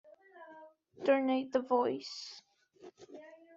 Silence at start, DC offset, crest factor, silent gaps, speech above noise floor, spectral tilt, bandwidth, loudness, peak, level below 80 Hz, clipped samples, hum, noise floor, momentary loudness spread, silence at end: 0.35 s; under 0.1%; 20 dB; none; 26 dB; -2.5 dB/octave; 7.8 kHz; -33 LUFS; -16 dBFS; -84 dBFS; under 0.1%; none; -58 dBFS; 24 LU; 0.2 s